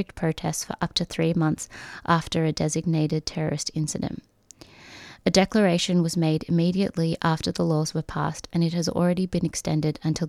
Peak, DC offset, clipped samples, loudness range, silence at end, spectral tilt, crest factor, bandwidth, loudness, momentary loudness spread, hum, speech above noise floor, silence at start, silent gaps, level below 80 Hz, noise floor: -4 dBFS; under 0.1%; under 0.1%; 4 LU; 0 s; -5.5 dB/octave; 20 dB; 14 kHz; -25 LUFS; 8 LU; none; 26 dB; 0 s; none; -50 dBFS; -51 dBFS